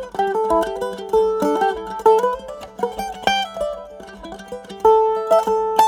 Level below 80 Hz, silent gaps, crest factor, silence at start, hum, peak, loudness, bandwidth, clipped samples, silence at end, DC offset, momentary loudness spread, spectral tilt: -48 dBFS; none; 18 dB; 0 s; none; -2 dBFS; -19 LUFS; 18.5 kHz; under 0.1%; 0 s; under 0.1%; 18 LU; -4 dB/octave